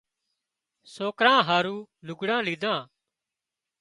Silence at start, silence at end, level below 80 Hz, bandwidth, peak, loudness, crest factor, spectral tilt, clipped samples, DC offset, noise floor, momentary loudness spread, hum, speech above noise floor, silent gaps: 0.9 s; 0.95 s; -76 dBFS; 11.5 kHz; -4 dBFS; -25 LUFS; 24 dB; -4.5 dB/octave; under 0.1%; under 0.1%; -88 dBFS; 13 LU; none; 63 dB; none